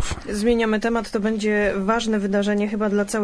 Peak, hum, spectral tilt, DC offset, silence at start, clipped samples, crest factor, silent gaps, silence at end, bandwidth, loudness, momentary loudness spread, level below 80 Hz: -6 dBFS; none; -5 dB/octave; under 0.1%; 0 s; under 0.1%; 16 dB; none; 0 s; 11 kHz; -21 LUFS; 3 LU; -40 dBFS